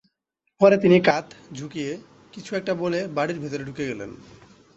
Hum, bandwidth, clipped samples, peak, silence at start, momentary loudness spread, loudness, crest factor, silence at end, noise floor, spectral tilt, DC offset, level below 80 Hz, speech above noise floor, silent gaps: none; 8 kHz; under 0.1%; -4 dBFS; 0.6 s; 21 LU; -23 LUFS; 20 dB; 0.6 s; -76 dBFS; -6.5 dB/octave; under 0.1%; -62 dBFS; 54 dB; none